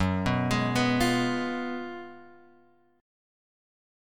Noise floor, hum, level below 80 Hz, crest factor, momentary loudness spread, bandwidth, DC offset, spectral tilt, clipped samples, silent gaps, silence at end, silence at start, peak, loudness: -62 dBFS; none; -50 dBFS; 18 dB; 15 LU; 17.5 kHz; under 0.1%; -5.5 dB/octave; under 0.1%; none; 1.7 s; 0 s; -12 dBFS; -27 LUFS